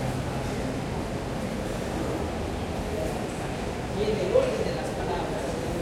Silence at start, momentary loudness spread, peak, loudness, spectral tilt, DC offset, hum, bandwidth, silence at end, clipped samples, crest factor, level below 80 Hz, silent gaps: 0 s; 7 LU; -10 dBFS; -29 LUFS; -6 dB/octave; under 0.1%; none; 16.5 kHz; 0 s; under 0.1%; 18 dB; -40 dBFS; none